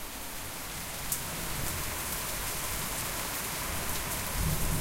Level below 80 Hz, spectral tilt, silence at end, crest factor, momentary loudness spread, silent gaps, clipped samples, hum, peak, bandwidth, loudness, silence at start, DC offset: -42 dBFS; -2.5 dB/octave; 0 s; 22 dB; 6 LU; none; under 0.1%; none; -12 dBFS; 16 kHz; -33 LUFS; 0 s; under 0.1%